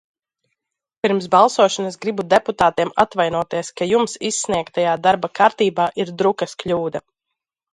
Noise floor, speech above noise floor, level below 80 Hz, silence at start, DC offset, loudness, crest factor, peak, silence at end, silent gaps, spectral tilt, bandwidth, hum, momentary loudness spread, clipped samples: -83 dBFS; 64 dB; -56 dBFS; 1.05 s; under 0.1%; -18 LUFS; 18 dB; 0 dBFS; 0.75 s; none; -4 dB/octave; 11.5 kHz; none; 9 LU; under 0.1%